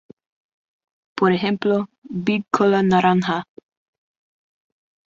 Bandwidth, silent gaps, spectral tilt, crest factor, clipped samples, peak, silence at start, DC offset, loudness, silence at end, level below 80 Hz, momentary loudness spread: 7.6 kHz; 1.98-2.02 s; -7 dB/octave; 20 dB; under 0.1%; -2 dBFS; 1.15 s; under 0.1%; -20 LUFS; 1.65 s; -62 dBFS; 10 LU